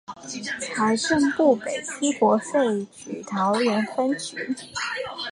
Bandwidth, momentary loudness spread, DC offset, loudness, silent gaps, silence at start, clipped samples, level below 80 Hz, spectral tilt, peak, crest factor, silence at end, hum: 11.5 kHz; 10 LU; under 0.1%; -24 LUFS; none; 0.1 s; under 0.1%; -62 dBFS; -4 dB/octave; -6 dBFS; 18 dB; 0 s; none